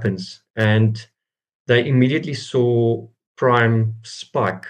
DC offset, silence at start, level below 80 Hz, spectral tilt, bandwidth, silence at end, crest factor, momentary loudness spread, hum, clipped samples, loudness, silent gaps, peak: under 0.1%; 0 s; -64 dBFS; -7 dB/octave; 9.2 kHz; 0 s; 18 dB; 14 LU; none; under 0.1%; -19 LUFS; 0.50-0.54 s, 1.55-1.65 s, 3.27-3.35 s; -2 dBFS